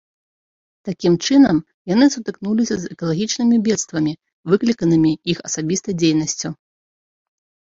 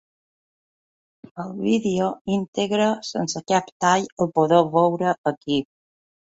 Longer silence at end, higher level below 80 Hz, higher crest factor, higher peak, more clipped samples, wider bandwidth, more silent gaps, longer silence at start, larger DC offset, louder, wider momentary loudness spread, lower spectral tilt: first, 1.25 s vs 0.75 s; first, -56 dBFS vs -62 dBFS; about the same, 16 dB vs 20 dB; about the same, -2 dBFS vs -2 dBFS; neither; about the same, 7.8 kHz vs 8 kHz; second, 1.74-1.85 s, 4.33-4.44 s vs 2.21-2.25 s, 2.48-2.53 s, 3.72-3.80 s, 4.12-4.17 s, 5.18-5.24 s, 5.37-5.41 s; second, 0.85 s vs 1.35 s; neither; first, -18 LUFS vs -22 LUFS; about the same, 11 LU vs 9 LU; about the same, -5 dB/octave vs -5 dB/octave